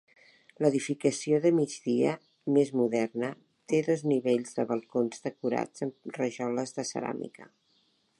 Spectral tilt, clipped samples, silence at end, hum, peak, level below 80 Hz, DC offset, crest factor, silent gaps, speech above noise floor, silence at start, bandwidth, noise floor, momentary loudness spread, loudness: -6 dB/octave; under 0.1%; 0.75 s; none; -10 dBFS; -80 dBFS; under 0.1%; 18 dB; none; 41 dB; 0.6 s; 11.5 kHz; -70 dBFS; 10 LU; -30 LUFS